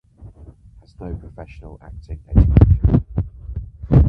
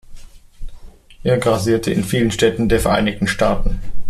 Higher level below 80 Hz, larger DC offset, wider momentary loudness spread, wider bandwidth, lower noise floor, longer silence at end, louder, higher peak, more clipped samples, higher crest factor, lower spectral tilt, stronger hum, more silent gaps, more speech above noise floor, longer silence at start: first, -22 dBFS vs -28 dBFS; neither; first, 25 LU vs 5 LU; second, 3.5 kHz vs 14.5 kHz; first, -45 dBFS vs -37 dBFS; about the same, 0 s vs 0 s; about the same, -17 LUFS vs -17 LUFS; about the same, 0 dBFS vs -2 dBFS; neither; about the same, 18 dB vs 16 dB; first, -12 dB/octave vs -5.5 dB/octave; neither; neither; first, 29 dB vs 21 dB; first, 0.25 s vs 0.1 s